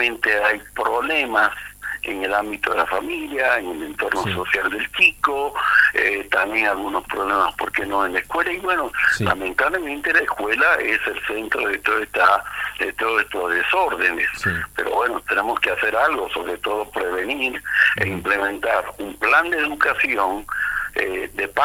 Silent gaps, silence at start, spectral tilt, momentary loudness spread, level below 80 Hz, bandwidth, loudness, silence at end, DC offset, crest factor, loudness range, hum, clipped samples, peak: none; 0 s; -4 dB/octave; 8 LU; -48 dBFS; 17 kHz; -20 LUFS; 0 s; under 0.1%; 20 dB; 3 LU; 50 Hz at -50 dBFS; under 0.1%; 0 dBFS